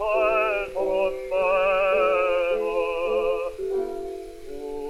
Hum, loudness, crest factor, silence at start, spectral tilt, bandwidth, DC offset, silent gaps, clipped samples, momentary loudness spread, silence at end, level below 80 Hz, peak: none; -24 LUFS; 14 dB; 0 s; -4.5 dB/octave; 13 kHz; under 0.1%; none; under 0.1%; 14 LU; 0 s; -48 dBFS; -10 dBFS